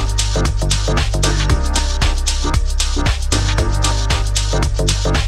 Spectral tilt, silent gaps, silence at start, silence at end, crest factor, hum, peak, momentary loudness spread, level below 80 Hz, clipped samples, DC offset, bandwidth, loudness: -4 dB/octave; none; 0 s; 0 s; 14 dB; none; -2 dBFS; 2 LU; -18 dBFS; under 0.1%; under 0.1%; 13.5 kHz; -17 LUFS